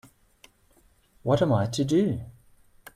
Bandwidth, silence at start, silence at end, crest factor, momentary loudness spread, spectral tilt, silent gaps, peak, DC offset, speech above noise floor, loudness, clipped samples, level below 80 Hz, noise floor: 14.5 kHz; 1.25 s; 0.65 s; 18 dB; 13 LU; -7 dB/octave; none; -10 dBFS; under 0.1%; 38 dB; -25 LUFS; under 0.1%; -56 dBFS; -62 dBFS